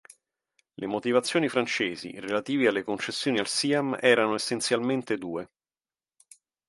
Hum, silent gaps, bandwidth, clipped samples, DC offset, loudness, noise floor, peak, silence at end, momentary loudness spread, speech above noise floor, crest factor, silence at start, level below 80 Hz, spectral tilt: none; none; 11.5 kHz; under 0.1%; under 0.1%; -27 LUFS; under -90 dBFS; -6 dBFS; 1.25 s; 10 LU; over 63 dB; 22 dB; 0.8 s; -72 dBFS; -3.5 dB/octave